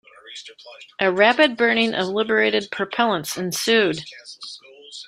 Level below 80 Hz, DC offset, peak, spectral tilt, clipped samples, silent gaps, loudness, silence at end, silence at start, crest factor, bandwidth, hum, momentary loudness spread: -66 dBFS; under 0.1%; -2 dBFS; -3 dB/octave; under 0.1%; none; -19 LUFS; 0 s; 0.25 s; 20 dB; 14.5 kHz; none; 21 LU